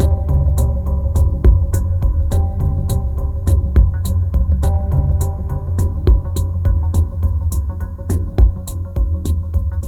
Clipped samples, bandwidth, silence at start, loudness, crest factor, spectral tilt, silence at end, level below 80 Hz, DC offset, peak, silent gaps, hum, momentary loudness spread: under 0.1%; 14.5 kHz; 0 s; -18 LUFS; 16 dB; -8 dB/octave; 0 s; -18 dBFS; under 0.1%; 0 dBFS; none; none; 6 LU